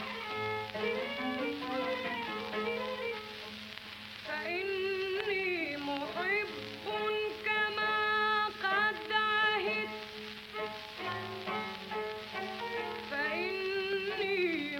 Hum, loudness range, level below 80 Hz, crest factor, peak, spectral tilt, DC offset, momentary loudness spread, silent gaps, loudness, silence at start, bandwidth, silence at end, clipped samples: none; 6 LU; -70 dBFS; 18 dB; -16 dBFS; -4 dB/octave; under 0.1%; 11 LU; none; -34 LUFS; 0 s; 17 kHz; 0 s; under 0.1%